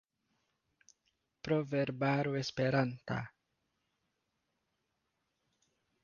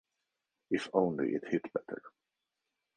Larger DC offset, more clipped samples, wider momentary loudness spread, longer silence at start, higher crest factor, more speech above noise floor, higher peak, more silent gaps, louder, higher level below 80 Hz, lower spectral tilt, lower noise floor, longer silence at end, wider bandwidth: neither; neither; second, 9 LU vs 12 LU; first, 1.45 s vs 0.7 s; about the same, 20 dB vs 24 dB; second, 50 dB vs 54 dB; second, -20 dBFS vs -14 dBFS; neither; about the same, -35 LUFS vs -34 LUFS; about the same, -72 dBFS vs -76 dBFS; about the same, -5.5 dB/octave vs -6.5 dB/octave; second, -83 dBFS vs -87 dBFS; first, 2.75 s vs 0.9 s; second, 7.2 kHz vs 9.8 kHz